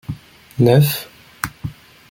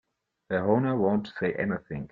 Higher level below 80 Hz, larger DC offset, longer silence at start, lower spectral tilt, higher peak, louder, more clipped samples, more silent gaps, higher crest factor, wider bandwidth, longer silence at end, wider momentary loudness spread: first, -48 dBFS vs -60 dBFS; neither; second, 0.1 s vs 0.5 s; second, -6.5 dB/octave vs -9.5 dB/octave; first, 0 dBFS vs -10 dBFS; first, -17 LUFS vs -28 LUFS; neither; neither; about the same, 18 dB vs 18 dB; first, 17 kHz vs 5 kHz; first, 0.4 s vs 0.05 s; first, 21 LU vs 7 LU